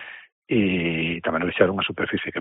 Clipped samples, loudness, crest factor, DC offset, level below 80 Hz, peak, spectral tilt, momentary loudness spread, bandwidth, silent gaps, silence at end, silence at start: under 0.1%; -23 LUFS; 22 dB; under 0.1%; -54 dBFS; -2 dBFS; -4 dB/octave; 5 LU; 4 kHz; 0.32-0.42 s; 0 s; 0 s